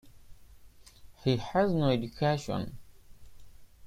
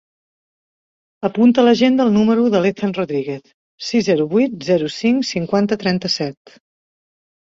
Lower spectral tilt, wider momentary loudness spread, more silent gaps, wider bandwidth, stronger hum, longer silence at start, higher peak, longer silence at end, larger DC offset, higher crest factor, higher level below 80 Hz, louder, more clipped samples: about the same, -7 dB/octave vs -6 dB/octave; about the same, 9 LU vs 11 LU; second, none vs 3.54-3.78 s; first, 15.5 kHz vs 7.6 kHz; neither; second, 0.05 s vs 1.2 s; second, -14 dBFS vs -2 dBFS; second, 0 s vs 1.15 s; neither; about the same, 20 dB vs 16 dB; about the same, -54 dBFS vs -58 dBFS; second, -30 LUFS vs -17 LUFS; neither